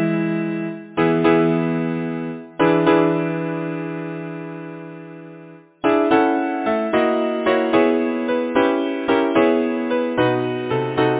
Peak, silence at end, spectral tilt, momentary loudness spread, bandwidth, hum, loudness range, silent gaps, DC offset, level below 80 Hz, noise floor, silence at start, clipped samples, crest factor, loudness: -2 dBFS; 0 s; -10.5 dB/octave; 14 LU; 4 kHz; none; 4 LU; none; under 0.1%; -56 dBFS; -42 dBFS; 0 s; under 0.1%; 16 dB; -19 LUFS